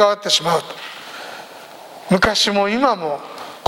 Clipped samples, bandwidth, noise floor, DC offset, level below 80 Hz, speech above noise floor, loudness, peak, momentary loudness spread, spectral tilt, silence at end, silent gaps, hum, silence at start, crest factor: under 0.1%; 17 kHz; -38 dBFS; under 0.1%; -48 dBFS; 21 dB; -17 LUFS; 0 dBFS; 21 LU; -3.5 dB/octave; 0 s; none; none; 0 s; 20 dB